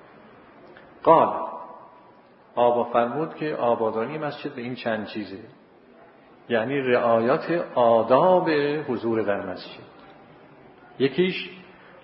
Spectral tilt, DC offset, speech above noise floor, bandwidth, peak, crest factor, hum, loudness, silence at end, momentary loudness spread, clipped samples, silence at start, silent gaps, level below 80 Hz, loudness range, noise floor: -10.5 dB/octave; under 0.1%; 30 dB; 5.8 kHz; -2 dBFS; 22 dB; none; -23 LUFS; 0.4 s; 17 LU; under 0.1%; 0.65 s; none; -70 dBFS; 7 LU; -52 dBFS